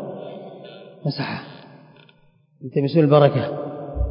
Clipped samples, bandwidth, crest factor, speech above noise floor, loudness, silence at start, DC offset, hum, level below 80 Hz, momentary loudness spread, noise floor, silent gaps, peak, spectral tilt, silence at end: under 0.1%; 5.4 kHz; 20 dB; 39 dB; -20 LUFS; 0 s; under 0.1%; none; -38 dBFS; 24 LU; -57 dBFS; none; -2 dBFS; -12 dB/octave; 0 s